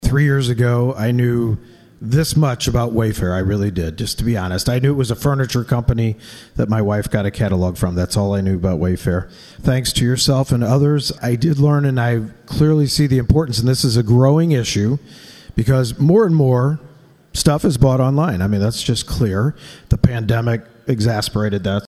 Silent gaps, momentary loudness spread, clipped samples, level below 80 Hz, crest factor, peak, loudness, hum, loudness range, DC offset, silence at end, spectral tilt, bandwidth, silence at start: none; 8 LU; under 0.1%; -34 dBFS; 16 dB; 0 dBFS; -17 LUFS; none; 3 LU; under 0.1%; 0 s; -6 dB/octave; 14.5 kHz; 0 s